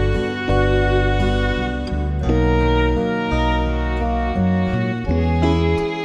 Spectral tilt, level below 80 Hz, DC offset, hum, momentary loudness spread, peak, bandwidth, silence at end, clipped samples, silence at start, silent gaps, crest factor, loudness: -7.5 dB/octave; -24 dBFS; under 0.1%; none; 5 LU; -6 dBFS; 8.6 kHz; 0 s; under 0.1%; 0 s; none; 12 dB; -19 LUFS